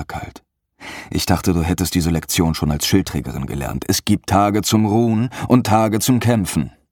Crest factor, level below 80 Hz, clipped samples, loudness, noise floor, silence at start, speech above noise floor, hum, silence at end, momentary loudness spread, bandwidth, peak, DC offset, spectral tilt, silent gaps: 16 dB; -36 dBFS; under 0.1%; -18 LUFS; -47 dBFS; 0 s; 29 dB; none; 0.2 s; 10 LU; 18.5 kHz; 0 dBFS; under 0.1%; -5 dB/octave; none